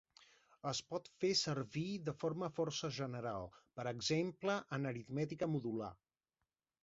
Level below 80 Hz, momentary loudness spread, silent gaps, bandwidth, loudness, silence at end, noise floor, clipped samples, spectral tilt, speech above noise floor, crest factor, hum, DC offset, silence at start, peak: -74 dBFS; 10 LU; none; 7.6 kHz; -41 LUFS; 0.9 s; under -90 dBFS; under 0.1%; -4.5 dB/octave; over 49 dB; 18 dB; none; under 0.1%; 0.2 s; -24 dBFS